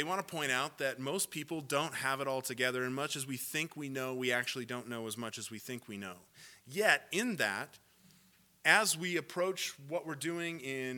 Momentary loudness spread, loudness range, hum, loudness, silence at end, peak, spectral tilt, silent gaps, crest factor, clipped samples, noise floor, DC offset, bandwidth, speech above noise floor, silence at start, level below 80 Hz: 13 LU; 5 LU; none; -35 LUFS; 0 s; -10 dBFS; -3 dB/octave; none; 26 dB; under 0.1%; -66 dBFS; under 0.1%; 19 kHz; 31 dB; 0 s; -84 dBFS